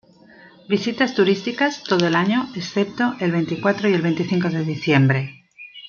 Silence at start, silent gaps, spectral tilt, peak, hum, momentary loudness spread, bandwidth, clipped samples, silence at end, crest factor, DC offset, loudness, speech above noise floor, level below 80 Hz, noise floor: 0.7 s; none; -6.5 dB/octave; -2 dBFS; none; 7 LU; 7 kHz; under 0.1%; 0 s; 18 dB; under 0.1%; -20 LUFS; 28 dB; -64 dBFS; -48 dBFS